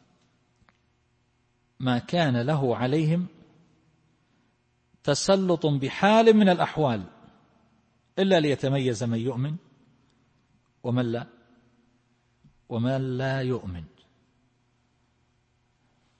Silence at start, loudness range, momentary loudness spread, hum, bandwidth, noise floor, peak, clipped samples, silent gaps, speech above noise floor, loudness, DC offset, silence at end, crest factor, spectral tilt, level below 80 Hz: 1.8 s; 10 LU; 15 LU; none; 8.8 kHz; -69 dBFS; -6 dBFS; under 0.1%; none; 45 dB; -25 LUFS; under 0.1%; 2.35 s; 20 dB; -6 dB/octave; -62 dBFS